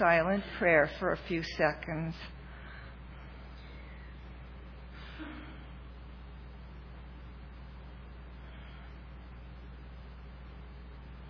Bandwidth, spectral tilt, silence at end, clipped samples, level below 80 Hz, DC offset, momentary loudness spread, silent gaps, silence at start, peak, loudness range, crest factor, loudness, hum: 5.4 kHz; -4.5 dB/octave; 0 s; under 0.1%; -48 dBFS; under 0.1%; 21 LU; none; 0 s; -12 dBFS; 17 LU; 24 dB; -31 LUFS; none